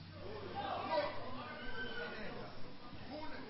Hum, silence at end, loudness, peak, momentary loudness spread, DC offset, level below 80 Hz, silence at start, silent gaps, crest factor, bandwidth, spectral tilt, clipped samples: none; 0 s; -44 LUFS; -26 dBFS; 13 LU; under 0.1%; -60 dBFS; 0 s; none; 18 dB; 5.6 kHz; -3 dB/octave; under 0.1%